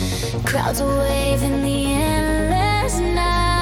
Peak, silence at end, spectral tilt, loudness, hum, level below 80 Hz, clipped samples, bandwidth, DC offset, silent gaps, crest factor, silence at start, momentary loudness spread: -6 dBFS; 0 s; -5 dB/octave; -19 LUFS; none; -26 dBFS; under 0.1%; 17.5 kHz; under 0.1%; none; 12 dB; 0 s; 2 LU